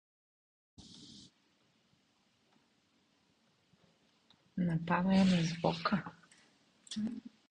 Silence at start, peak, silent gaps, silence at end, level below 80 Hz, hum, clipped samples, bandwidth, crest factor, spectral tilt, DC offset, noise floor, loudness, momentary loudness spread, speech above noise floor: 0.8 s; -18 dBFS; none; 0.25 s; -68 dBFS; none; under 0.1%; 9.6 kHz; 20 dB; -6.5 dB/octave; under 0.1%; -74 dBFS; -34 LUFS; 25 LU; 42 dB